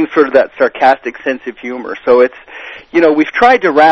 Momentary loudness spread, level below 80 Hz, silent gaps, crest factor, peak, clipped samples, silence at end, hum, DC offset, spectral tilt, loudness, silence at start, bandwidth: 14 LU; -52 dBFS; none; 12 dB; 0 dBFS; 0.7%; 0 s; none; under 0.1%; -5.5 dB/octave; -11 LUFS; 0 s; 7.2 kHz